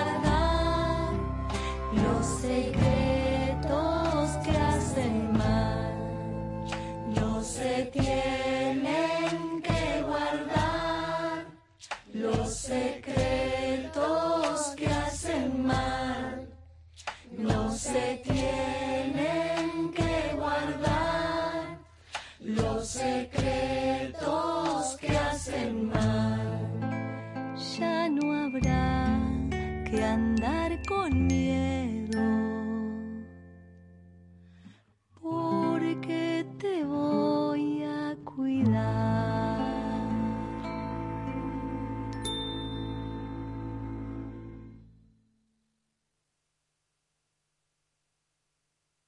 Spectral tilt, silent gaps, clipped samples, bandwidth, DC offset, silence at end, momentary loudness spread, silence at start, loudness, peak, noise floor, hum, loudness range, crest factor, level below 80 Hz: -6 dB/octave; none; under 0.1%; 11.5 kHz; under 0.1%; 4.25 s; 10 LU; 0 s; -30 LUFS; -12 dBFS; -81 dBFS; none; 7 LU; 18 dB; -42 dBFS